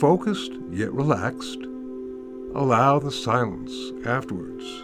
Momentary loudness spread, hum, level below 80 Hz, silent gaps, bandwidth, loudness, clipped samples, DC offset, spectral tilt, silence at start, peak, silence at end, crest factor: 15 LU; none; -56 dBFS; none; 13.5 kHz; -25 LUFS; under 0.1%; under 0.1%; -6.5 dB/octave; 0 s; -4 dBFS; 0 s; 20 dB